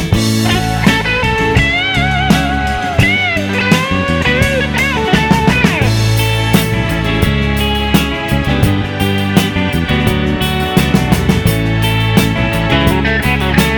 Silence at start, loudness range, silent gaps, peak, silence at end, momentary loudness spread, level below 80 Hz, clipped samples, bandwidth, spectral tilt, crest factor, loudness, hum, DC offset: 0 s; 2 LU; none; 0 dBFS; 0 s; 3 LU; -22 dBFS; 0.1%; over 20 kHz; -5.5 dB/octave; 12 dB; -12 LUFS; none; under 0.1%